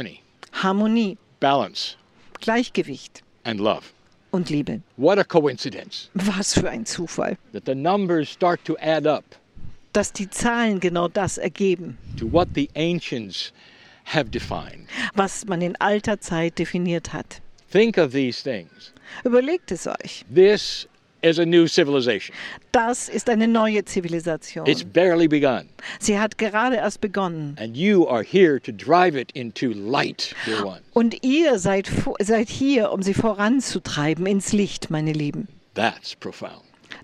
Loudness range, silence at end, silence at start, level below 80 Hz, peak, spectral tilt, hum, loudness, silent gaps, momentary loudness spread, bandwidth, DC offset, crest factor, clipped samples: 5 LU; 0 s; 0 s; -48 dBFS; 0 dBFS; -5 dB/octave; none; -22 LUFS; none; 13 LU; 13 kHz; under 0.1%; 22 dB; under 0.1%